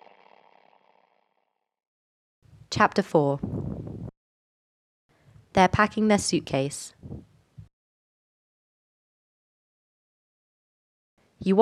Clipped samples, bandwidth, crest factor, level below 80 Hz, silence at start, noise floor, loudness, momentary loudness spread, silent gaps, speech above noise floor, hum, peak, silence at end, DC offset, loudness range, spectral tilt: under 0.1%; 13 kHz; 24 dB; -56 dBFS; 2.7 s; -76 dBFS; -25 LUFS; 20 LU; 4.17-5.09 s, 7.73-11.17 s; 53 dB; none; -4 dBFS; 0 s; under 0.1%; 7 LU; -5 dB/octave